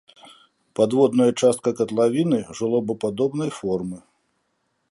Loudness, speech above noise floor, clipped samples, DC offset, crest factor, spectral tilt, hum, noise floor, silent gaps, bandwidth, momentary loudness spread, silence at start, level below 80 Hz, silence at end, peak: -21 LUFS; 51 dB; under 0.1%; under 0.1%; 18 dB; -6 dB/octave; none; -72 dBFS; none; 11.5 kHz; 9 LU; 0.25 s; -62 dBFS; 0.95 s; -4 dBFS